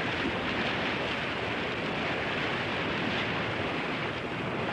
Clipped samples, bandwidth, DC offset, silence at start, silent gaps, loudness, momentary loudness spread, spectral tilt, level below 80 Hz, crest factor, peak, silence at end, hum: under 0.1%; 13 kHz; under 0.1%; 0 s; none; -30 LUFS; 3 LU; -5.5 dB/octave; -56 dBFS; 14 dB; -18 dBFS; 0 s; none